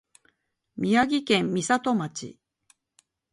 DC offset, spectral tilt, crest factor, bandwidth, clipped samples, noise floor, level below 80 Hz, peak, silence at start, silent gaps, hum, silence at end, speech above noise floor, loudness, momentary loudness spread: under 0.1%; -4.5 dB/octave; 20 dB; 11.5 kHz; under 0.1%; -71 dBFS; -66 dBFS; -8 dBFS; 0.75 s; none; none; 1 s; 47 dB; -24 LUFS; 17 LU